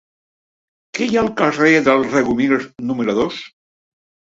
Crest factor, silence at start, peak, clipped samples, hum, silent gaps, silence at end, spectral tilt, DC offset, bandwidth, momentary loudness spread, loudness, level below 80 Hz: 18 dB; 0.95 s; -2 dBFS; under 0.1%; none; none; 0.85 s; -5 dB/octave; under 0.1%; 8 kHz; 10 LU; -17 LUFS; -52 dBFS